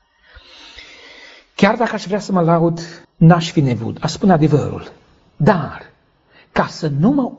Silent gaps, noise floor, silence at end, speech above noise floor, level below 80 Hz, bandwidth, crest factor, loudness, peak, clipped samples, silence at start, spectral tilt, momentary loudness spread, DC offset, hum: none; -53 dBFS; 0.05 s; 37 dB; -46 dBFS; 8 kHz; 18 dB; -16 LUFS; 0 dBFS; under 0.1%; 0.75 s; -6.5 dB/octave; 22 LU; under 0.1%; none